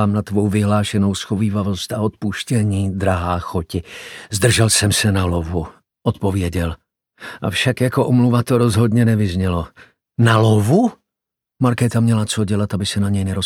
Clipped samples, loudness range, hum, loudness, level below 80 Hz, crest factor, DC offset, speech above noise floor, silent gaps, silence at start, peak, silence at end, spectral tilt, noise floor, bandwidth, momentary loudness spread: under 0.1%; 4 LU; none; -18 LUFS; -40 dBFS; 16 dB; under 0.1%; 67 dB; none; 0 s; 0 dBFS; 0 s; -5.5 dB/octave; -84 dBFS; 16.5 kHz; 12 LU